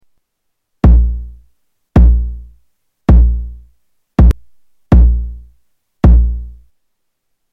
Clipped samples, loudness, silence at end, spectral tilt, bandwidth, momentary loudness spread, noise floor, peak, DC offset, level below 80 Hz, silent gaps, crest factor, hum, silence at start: under 0.1%; -13 LUFS; 1 s; -10 dB/octave; 3.6 kHz; 17 LU; -71 dBFS; 0 dBFS; 0.3%; -14 dBFS; none; 12 dB; none; 0.85 s